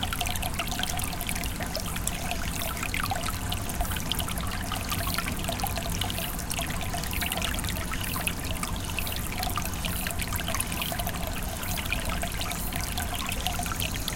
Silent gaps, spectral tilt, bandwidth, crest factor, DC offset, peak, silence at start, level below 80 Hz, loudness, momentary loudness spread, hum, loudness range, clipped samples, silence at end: none; -3 dB/octave; 17 kHz; 24 dB; under 0.1%; -6 dBFS; 0 s; -36 dBFS; -30 LUFS; 2 LU; none; 1 LU; under 0.1%; 0 s